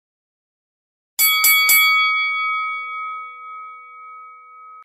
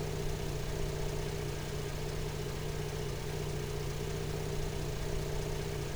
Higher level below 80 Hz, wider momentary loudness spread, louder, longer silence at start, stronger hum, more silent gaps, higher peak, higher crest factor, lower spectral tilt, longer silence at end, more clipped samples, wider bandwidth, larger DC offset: second, -76 dBFS vs -42 dBFS; first, 23 LU vs 1 LU; first, -14 LUFS vs -38 LUFS; first, 1.2 s vs 0 s; neither; neither; first, -2 dBFS vs -22 dBFS; about the same, 18 dB vs 14 dB; second, 5 dB/octave vs -5 dB/octave; about the same, 0 s vs 0 s; neither; second, 16 kHz vs over 20 kHz; second, under 0.1% vs 0.4%